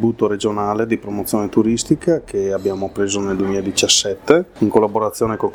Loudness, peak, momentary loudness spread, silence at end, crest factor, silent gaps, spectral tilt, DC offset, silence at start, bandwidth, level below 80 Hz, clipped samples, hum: -18 LUFS; 0 dBFS; 7 LU; 0 s; 18 dB; none; -4 dB/octave; under 0.1%; 0 s; 18.5 kHz; -48 dBFS; under 0.1%; none